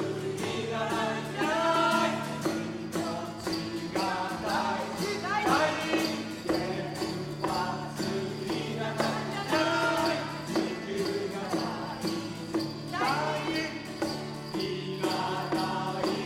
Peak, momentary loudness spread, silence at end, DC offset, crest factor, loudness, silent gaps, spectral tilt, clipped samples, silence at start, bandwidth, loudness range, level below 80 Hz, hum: -12 dBFS; 8 LU; 0 s; under 0.1%; 18 dB; -31 LUFS; none; -4.5 dB/octave; under 0.1%; 0 s; 16 kHz; 3 LU; -60 dBFS; none